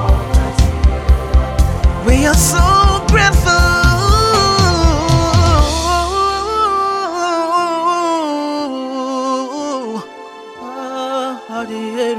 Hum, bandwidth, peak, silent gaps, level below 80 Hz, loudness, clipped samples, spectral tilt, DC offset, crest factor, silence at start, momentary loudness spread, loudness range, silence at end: none; 16 kHz; 0 dBFS; none; -18 dBFS; -14 LUFS; under 0.1%; -4.5 dB/octave; under 0.1%; 12 dB; 0 s; 12 LU; 10 LU; 0 s